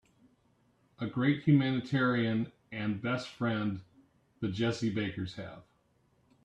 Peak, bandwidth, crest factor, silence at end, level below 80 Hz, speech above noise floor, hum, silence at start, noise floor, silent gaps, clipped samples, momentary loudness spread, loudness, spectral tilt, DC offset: -14 dBFS; 9.4 kHz; 20 dB; 0.85 s; -68 dBFS; 39 dB; none; 1 s; -71 dBFS; none; under 0.1%; 14 LU; -32 LUFS; -7 dB/octave; under 0.1%